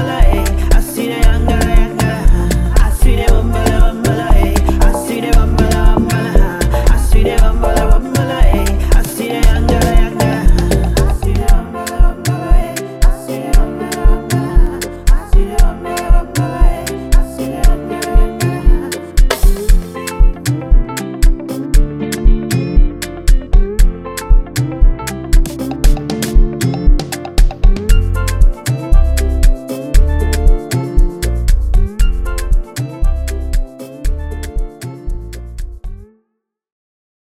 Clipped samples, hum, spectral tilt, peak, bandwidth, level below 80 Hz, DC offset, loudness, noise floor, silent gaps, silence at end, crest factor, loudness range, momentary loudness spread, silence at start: under 0.1%; none; -5.5 dB/octave; 0 dBFS; 15.5 kHz; -12 dBFS; 0.9%; -16 LUFS; -71 dBFS; none; 1.3 s; 10 dB; 5 LU; 8 LU; 0 s